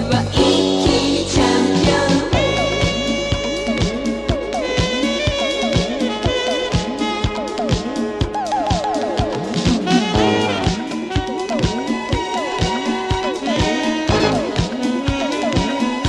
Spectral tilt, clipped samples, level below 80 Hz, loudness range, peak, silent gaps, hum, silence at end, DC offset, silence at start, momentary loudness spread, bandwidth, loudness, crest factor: -5 dB/octave; under 0.1%; -32 dBFS; 4 LU; -2 dBFS; none; none; 0 s; under 0.1%; 0 s; 6 LU; 12 kHz; -18 LUFS; 16 dB